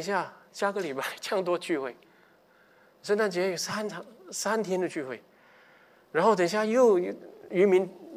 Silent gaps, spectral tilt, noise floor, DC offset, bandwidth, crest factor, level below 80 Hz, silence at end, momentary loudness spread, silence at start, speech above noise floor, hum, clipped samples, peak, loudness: none; -4.5 dB/octave; -61 dBFS; under 0.1%; 16 kHz; 18 dB; -82 dBFS; 0 s; 16 LU; 0 s; 34 dB; none; under 0.1%; -10 dBFS; -28 LUFS